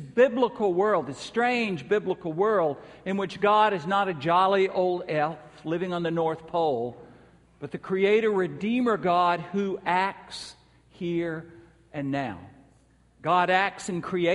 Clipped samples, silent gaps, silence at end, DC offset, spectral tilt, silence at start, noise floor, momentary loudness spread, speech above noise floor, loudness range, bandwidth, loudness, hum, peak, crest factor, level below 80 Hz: under 0.1%; none; 0 s; under 0.1%; -6 dB/octave; 0 s; -60 dBFS; 14 LU; 35 dB; 6 LU; 11.5 kHz; -26 LUFS; none; -8 dBFS; 18 dB; -64 dBFS